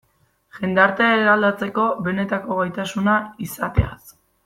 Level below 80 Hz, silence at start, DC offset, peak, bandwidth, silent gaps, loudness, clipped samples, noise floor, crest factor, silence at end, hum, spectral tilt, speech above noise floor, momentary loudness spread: -38 dBFS; 0.55 s; under 0.1%; -2 dBFS; 16 kHz; none; -20 LUFS; under 0.1%; -62 dBFS; 18 dB; 0.35 s; none; -6 dB/octave; 42 dB; 10 LU